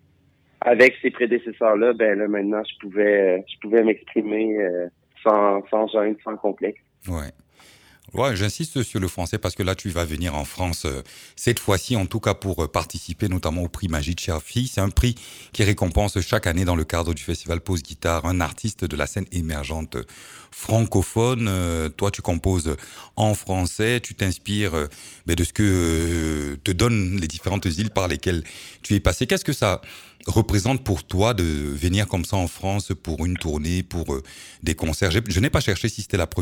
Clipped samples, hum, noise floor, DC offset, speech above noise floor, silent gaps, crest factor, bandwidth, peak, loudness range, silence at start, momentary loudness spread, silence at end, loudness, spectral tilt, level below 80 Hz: under 0.1%; none; -60 dBFS; under 0.1%; 37 dB; none; 18 dB; 18 kHz; -4 dBFS; 5 LU; 0.65 s; 10 LU; 0 s; -23 LUFS; -5.5 dB/octave; -36 dBFS